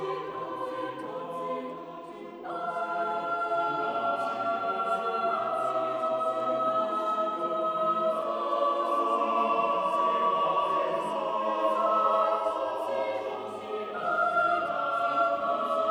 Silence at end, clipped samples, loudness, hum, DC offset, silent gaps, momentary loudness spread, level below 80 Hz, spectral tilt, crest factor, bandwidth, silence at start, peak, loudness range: 0 s; under 0.1%; -28 LUFS; none; under 0.1%; none; 10 LU; -76 dBFS; -5 dB/octave; 18 dB; 12 kHz; 0 s; -12 dBFS; 5 LU